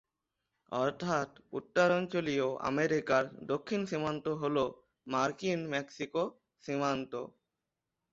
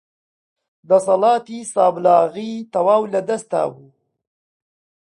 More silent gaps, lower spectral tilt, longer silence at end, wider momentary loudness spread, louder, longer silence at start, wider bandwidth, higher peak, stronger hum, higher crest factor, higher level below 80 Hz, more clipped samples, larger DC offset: neither; about the same, -5.5 dB/octave vs -5.5 dB/octave; second, 0.85 s vs 1.35 s; about the same, 10 LU vs 10 LU; second, -33 LUFS vs -18 LUFS; second, 0.7 s vs 0.9 s; second, 7.8 kHz vs 11.5 kHz; second, -16 dBFS vs -2 dBFS; neither; about the same, 18 dB vs 18 dB; about the same, -70 dBFS vs -70 dBFS; neither; neither